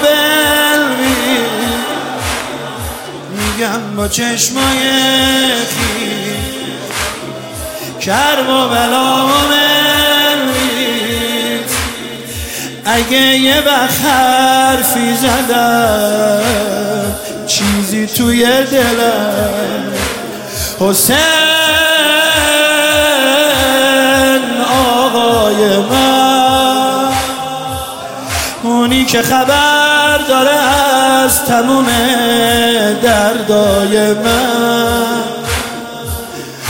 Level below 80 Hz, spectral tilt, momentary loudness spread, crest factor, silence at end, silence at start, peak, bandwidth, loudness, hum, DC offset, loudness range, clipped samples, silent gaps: -34 dBFS; -2.5 dB/octave; 11 LU; 12 dB; 0 s; 0 s; 0 dBFS; 17 kHz; -11 LUFS; none; 0.2%; 5 LU; under 0.1%; none